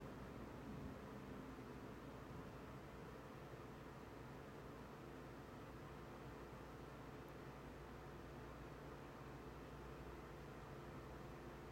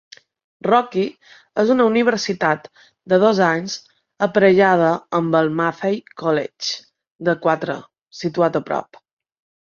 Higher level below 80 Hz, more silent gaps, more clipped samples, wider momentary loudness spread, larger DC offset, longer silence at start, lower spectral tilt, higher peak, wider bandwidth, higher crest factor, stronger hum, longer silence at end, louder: about the same, -64 dBFS vs -64 dBFS; second, none vs 7.07-7.19 s; neither; second, 2 LU vs 12 LU; neither; second, 0 s vs 0.65 s; about the same, -6.5 dB/octave vs -5.5 dB/octave; second, -42 dBFS vs -2 dBFS; first, 16 kHz vs 7.4 kHz; about the same, 14 dB vs 18 dB; neither; second, 0 s vs 0.8 s; second, -56 LUFS vs -19 LUFS